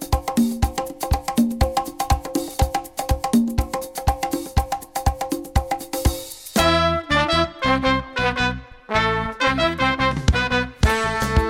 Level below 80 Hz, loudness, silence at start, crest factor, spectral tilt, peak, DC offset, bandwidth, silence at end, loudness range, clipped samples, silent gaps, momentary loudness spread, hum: -28 dBFS; -21 LUFS; 0 s; 14 dB; -5 dB/octave; -6 dBFS; under 0.1%; 17 kHz; 0 s; 3 LU; under 0.1%; none; 7 LU; none